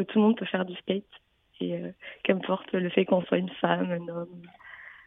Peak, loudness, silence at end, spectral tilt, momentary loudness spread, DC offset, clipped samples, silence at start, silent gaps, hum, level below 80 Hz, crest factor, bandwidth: -6 dBFS; -28 LUFS; 0.1 s; -10 dB/octave; 17 LU; under 0.1%; under 0.1%; 0 s; none; none; -72 dBFS; 22 dB; 3.9 kHz